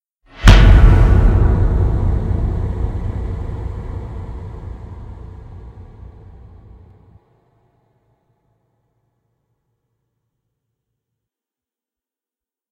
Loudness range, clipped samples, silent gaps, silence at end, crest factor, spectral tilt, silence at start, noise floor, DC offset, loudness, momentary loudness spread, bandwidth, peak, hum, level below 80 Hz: 25 LU; 0.2%; none; 6.9 s; 18 dB; -6.5 dB/octave; 0.4 s; under -90 dBFS; under 0.1%; -15 LUFS; 25 LU; 8.2 kHz; 0 dBFS; none; -18 dBFS